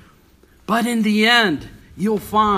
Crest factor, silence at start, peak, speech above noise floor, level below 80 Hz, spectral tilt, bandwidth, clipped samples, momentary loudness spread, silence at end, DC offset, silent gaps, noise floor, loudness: 18 dB; 0.7 s; 0 dBFS; 35 dB; -48 dBFS; -4.5 dB/octave; 15.5 kHz; under 0.1%; 13 LU; 0 s; under 0.1%; none; -52 dBFS; -17 LUFS